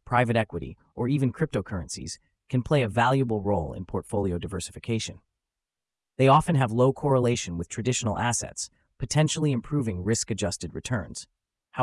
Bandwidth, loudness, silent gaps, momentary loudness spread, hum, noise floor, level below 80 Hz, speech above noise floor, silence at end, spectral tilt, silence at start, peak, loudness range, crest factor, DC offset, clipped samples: 12 kHz; -26 LUFS; none; 14 LU; none; under -90 dBFS; -52 dBFS; over 64 dB; 0 s; -5.5 dB/octave; 0.05 s; -6 dBFS; 4 LU; 22 dB; under 0.1%; under 0.1%